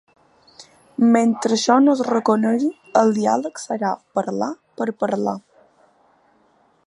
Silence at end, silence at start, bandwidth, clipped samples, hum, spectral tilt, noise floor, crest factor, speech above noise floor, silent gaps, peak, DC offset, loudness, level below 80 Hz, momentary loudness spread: 1.45 s; 0.6 s; 11 kHz; under 0.1%; none; -5 dB/octave; -59 dBFS; 18 dB; 41 dB; none; -2 dBFS; under 0.1%; -19 LUFS; -72 dBFS; 12 LU